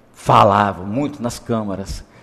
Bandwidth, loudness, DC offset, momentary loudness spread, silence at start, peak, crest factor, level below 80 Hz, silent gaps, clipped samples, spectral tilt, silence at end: 15 kHz; -17 LUFS; under 0.1%; 15 LU; 0.2 s; -2 dBFS; 16 dB; -40 dBFS; none; under 0.1%; -6 dB/octave; 0.2 s